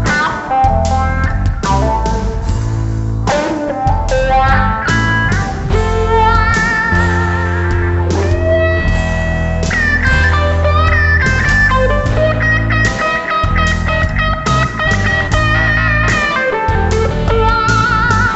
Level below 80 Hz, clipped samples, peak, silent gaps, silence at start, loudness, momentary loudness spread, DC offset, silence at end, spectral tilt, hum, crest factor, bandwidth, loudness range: -20 dBFS; under 0.1%; 0 dBFS; none; 0 s; -13 LUFS; 5 LU; under 0.1%; 0 s; -5.5 dB/octave; none; 12 dB; 8.2 kHz; 3 LU